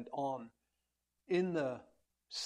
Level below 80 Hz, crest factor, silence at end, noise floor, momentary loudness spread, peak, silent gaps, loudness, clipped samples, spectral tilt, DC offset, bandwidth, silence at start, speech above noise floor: -80 dBFS; 18 dB; 0 s; -86 dBFS; 14 LU; -22 dBFS; none; -38 LUFS; under 0.1%; -5 dB/octave; under 0.1%; 10 kHz; 0 s; 49 dB